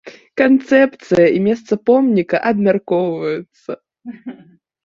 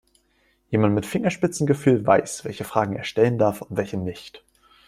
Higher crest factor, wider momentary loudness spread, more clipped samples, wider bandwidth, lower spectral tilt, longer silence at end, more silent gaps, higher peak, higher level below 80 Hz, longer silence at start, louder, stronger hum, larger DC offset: second, 14 dB vs 20 dB; first, 19 LU vs 11 LU; neither; second, 7.4 kHz vs 15.5 kHz; first, -7.5 dB/octave vs -6 dB/octave; about the same, 0.5 s vs 0.5 s; neither; about the same, -2 dBFS vs -2 dBFS; about the same, -58 dBFS vs -56 dBFS; second, 0.05 s vs 0.7 s; first, -15 LUFS vs -23 LUFS; neither; neither